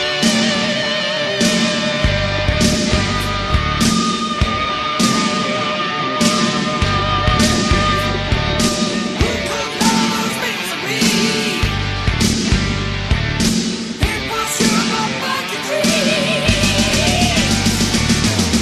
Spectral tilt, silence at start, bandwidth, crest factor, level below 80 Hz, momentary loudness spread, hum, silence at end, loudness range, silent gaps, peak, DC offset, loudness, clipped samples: -3.5 dB/octave; 0 s; 13.5 kHz; 16 dB; -28 dBFS; 5 LU; none; 0 s; 2 LU; none; 0 dBFS; under 0.1%; -16 LUFS; under 0.1%